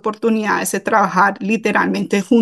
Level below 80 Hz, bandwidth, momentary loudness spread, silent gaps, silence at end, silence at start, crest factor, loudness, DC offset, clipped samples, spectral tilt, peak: -64 dBFS; 12.5 kHz; 4 LU; none; 0 s; 0.05 s; 14 dB; -16 LUFS; under 0.1%; under 0.1%; -5 dB/octave; -2 dBFS